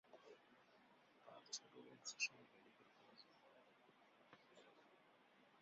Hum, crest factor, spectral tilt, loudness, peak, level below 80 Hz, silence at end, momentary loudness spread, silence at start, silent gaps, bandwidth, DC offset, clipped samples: none; 30 dB; 1 dB/octave; -50 LUFS; -30 dBFS; under -90 dBFS; 0 s; 23 LU; 0.05 s; none; 7.4 kHz; under 0.1%; under 0.1%